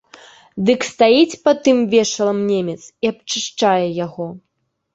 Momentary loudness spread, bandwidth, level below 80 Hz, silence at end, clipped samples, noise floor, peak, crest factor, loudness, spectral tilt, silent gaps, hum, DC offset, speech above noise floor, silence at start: 13 LU; 8.2 kHz; -60 dBFS; 0.55 s; under 0.1%; -45 dBFS; -2 dBFS; 16 dB; -17 LUFS; -4.5 dB/octave; none; none; under 0.1%; 28 dB; 0.55 s